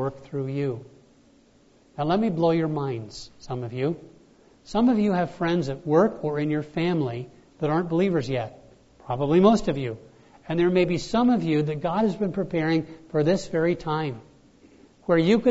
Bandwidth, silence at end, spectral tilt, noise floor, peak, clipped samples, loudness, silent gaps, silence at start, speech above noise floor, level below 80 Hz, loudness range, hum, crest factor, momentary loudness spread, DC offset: 8 kHz; 0 s; -7.5 dB/octave; -58 dBFS; -6 dBFS; under 0.1%; -24 LUFS; none; 0 s; 34 dB; -52 dBFS; 4 LU; none; 18 dB; 13 LU; under 0.1%